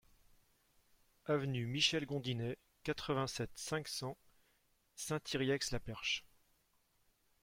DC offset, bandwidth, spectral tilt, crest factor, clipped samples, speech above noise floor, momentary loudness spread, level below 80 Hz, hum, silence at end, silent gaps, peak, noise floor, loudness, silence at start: under 0.1%; 16.5 kHz; -4 dB/octave; 24 dB; under 0.1%; 37 dB; 12 LU; -62 dBFS; none; 1.15 s; none; -18 dBFS; -76 dBFS; -39 LUFS; 1.25 s